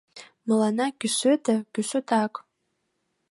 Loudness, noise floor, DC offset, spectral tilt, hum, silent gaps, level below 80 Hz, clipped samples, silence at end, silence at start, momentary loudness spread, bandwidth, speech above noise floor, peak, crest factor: -25 LUFS; -76 dBFS; under 0.1%; -4 dB/octave; none; none; -80 dBFS; under 0.1%; 0.9 s; 0.15 s; 9 LU; 11.5 kHz; 52 dB; -10 dBFS; 16 dB